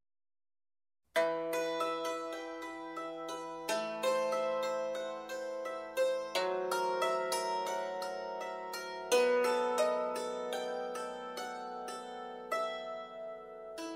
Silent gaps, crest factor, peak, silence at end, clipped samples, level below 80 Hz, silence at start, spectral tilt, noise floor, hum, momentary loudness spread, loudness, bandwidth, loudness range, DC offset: none; 18 dB; -18 dBFS; 0 s; under 0.1%; -80 dBFS; 1.15 s; -2 dB/octave; under -90 dBFS; none; 11 LU; -36 LUFS; 16 kHz; 4 LU; under 0.1%